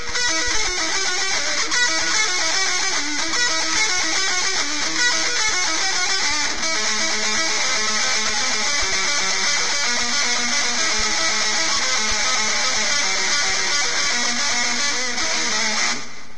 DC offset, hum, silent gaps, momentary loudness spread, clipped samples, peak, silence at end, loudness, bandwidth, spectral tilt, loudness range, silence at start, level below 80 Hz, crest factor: 5%; none; none; 2 LU; under 0.1%; -6 dBFS; 0 s; -18 LUFS; 11 kHz; 1 dB/octave; 1 LU; 0 s; -44 dBFS; 14 dB